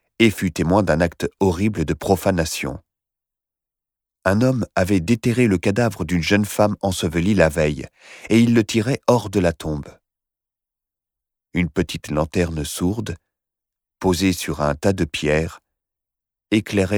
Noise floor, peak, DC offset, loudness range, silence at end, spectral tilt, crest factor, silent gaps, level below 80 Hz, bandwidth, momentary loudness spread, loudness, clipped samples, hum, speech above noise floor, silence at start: -88 dBFS; -2 dBFS; under 0.1%; 6 LU; 0 s; -6 dB/octave; 20 dB; none; -40 dBFS; 19.5 kHz; 9 LU; -20 LUFS; under 0.1%; none; 68 dB; 0.2 s